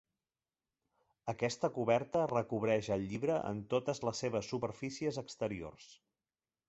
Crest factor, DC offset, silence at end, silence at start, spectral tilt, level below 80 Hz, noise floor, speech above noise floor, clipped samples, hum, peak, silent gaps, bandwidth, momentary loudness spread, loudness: 20 dB; under 0.1%; 0.75 s; 1.25 s; -5.5 dB/octave; -68 dBFS; under -90 dBFS; over 54 dB; under 0.1%; none; -16 dBFS; none; 8 kHz; 8 LU; -36 LUFS